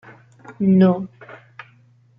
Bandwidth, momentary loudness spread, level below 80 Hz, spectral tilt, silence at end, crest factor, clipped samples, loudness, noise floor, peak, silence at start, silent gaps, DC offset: 5.2 kHz; 26 LU; -62 dBFS; -10.5 dB/octave; 0.85 s; 16 dB; under 0.1%; -17 LUFS; -54 dBFS; -4 dBFS; 0.5 s; none; under 0.1%